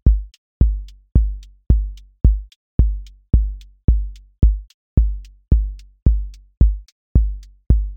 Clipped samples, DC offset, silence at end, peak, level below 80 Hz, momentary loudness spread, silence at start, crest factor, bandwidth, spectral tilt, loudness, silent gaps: under 0.1%; under 0.1%; 0 s; -2 dBFS; -18 dBFS; 13 LU; 0.05 s; 16 dB; 1.3 kHz; -10.5 dB/octave; -21 LUFS; 0.38-0.60 s, 2.56-2.79 s, 3.84-3.88 s, 4.74-4.97 s, 6.02-6.06 s, 6.92-7.15 s